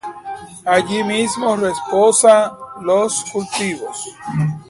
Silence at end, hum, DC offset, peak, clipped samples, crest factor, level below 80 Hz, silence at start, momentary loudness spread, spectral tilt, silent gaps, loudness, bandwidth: 0.05 s; none; under 0.1%; 0 dBFS; under 0.1%; 16 dB; -56 dBFS; 0.05 s; 16 LU; -4 dB/octave; none; -16 LUFS; 11.5 kHz